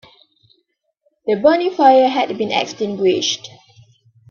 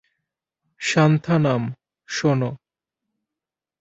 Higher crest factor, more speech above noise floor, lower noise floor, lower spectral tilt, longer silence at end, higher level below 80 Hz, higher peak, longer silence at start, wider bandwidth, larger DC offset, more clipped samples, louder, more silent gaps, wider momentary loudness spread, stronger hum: about the same, 18 dB vs 20 dB; second, 53 dB vs 69 dB; second, -68 dBFS vs -88 dBFS; second, -3.5 dB/octave vs -6 dB/octave; second, 0.85 s vs 1.25 s; about the same, -62 dBFS vs -60 dBFS; about the same, 0 dBFS vs -2 dBFS; first, 1.25 s vs 0.8 s; second, 7.2 kHz vs 8 kHz; neither; neither; first, -16 LUFS vs -21 LUFS; neither; about the same, 11 LU vs 12 LU; neither